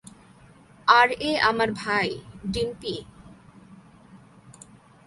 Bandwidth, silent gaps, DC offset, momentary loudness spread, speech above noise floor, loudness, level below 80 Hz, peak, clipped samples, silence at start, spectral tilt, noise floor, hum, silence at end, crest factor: 11.5 kHz; none; under 0.1%; 16 LU; 29 dB; -23 LUFS; -54 dBFS; -2 dBFS; under 0.1%; 0.85 s; -4 dB/octave; -52 dBFS; none; 0.55 s; 24 dB